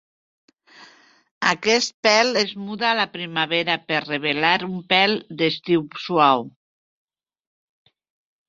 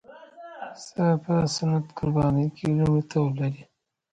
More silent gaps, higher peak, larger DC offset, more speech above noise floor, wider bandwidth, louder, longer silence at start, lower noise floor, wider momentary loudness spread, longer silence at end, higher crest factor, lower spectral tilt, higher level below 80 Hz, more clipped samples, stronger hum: first, 1.31-1.41 s, 1.94-2.03 s vs none; first, -2 dBFS vs -12 dBFS; neither; first, 30 dB vs 21 dB; second, 7.8 kHz vs 9.2 kHz; first, -20 LUFS vs -25 LUFS; first, 0.8 s vs 0.1 s; first, -51 dBFS vs -45 dBFS; second, 7 LU vs 17 LU; first, 2 s vs 0.5 s; first, 22 dB vs 14 dB; second, -3.5 dB/octave vs -7 dB/octave; second, -68 dBFS vs -52 dBFS; neither; neither